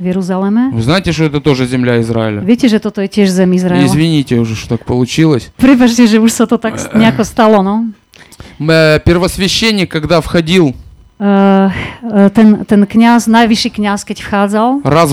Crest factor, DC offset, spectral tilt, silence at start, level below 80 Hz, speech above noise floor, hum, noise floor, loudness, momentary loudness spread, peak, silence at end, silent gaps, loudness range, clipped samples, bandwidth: 10 dB; under 0.1%; -6 dB/octave; 0 s; -34 dBFS; 26 dB; none; -36 dBFS; -10 LUFS; 8 LU; 0 dBFS; 0 s; none; 2 LU; 2%; 15 kHz